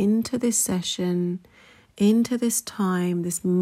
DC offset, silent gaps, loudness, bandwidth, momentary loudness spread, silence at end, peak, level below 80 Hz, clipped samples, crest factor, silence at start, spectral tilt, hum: under 0.1%; none; -23 LUFS; 16 kHz; 5 LU; 0 s; -10 dBFS; -64 dBFS; under 0.1%; 14 dB; 0 s; -5 dB/octave; none